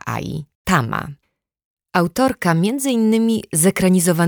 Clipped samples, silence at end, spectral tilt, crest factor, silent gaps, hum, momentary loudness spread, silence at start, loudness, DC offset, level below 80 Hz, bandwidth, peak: under 0.1%; 0 s; -5 dB/octave; 16 dB; 0.55-0.65 s, 1.65-1.77 s; none; 11 LU; 0.05 s; -18 LUFS; under 0.1%; -48 dBFS; over 20 kHz; -2 dBFS